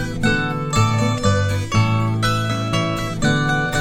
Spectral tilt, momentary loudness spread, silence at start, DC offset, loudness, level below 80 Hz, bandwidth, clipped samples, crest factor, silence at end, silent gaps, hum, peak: -5.5 dB/octave; 3 LU; 0 s; under 0.1%; -19 LUFS; -34 dBFS; 16 kHz; under 0.1%; 14 dB; 0 s; none; none; -4 dBFS